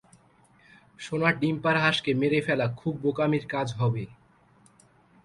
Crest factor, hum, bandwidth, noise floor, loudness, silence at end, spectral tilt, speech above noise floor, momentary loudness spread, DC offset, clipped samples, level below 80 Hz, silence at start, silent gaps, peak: 20 dB; none; 11.5 kHz; -60 dBFS; -26 LUFS; 1.1 s; -6.5 dB/octave; 34 dB; 10 LU; under 0.1%; under 0.1%; -62 dBFS; 1 s; none; -8 dBFS